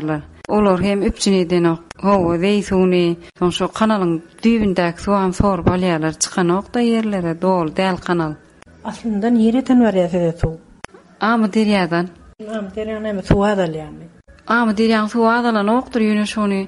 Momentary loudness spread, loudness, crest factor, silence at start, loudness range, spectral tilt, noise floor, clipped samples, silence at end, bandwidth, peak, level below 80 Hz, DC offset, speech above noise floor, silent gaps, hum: 10 LU; -17 LUFS; 14 dB; 0 s; 3 LU; -6 dB/octave; -40 dBFS; under 0.1%; 0 s; 11.5 kHz; -2 dBFS; -38 dBFS; under 0.1%; 23 dB; none; none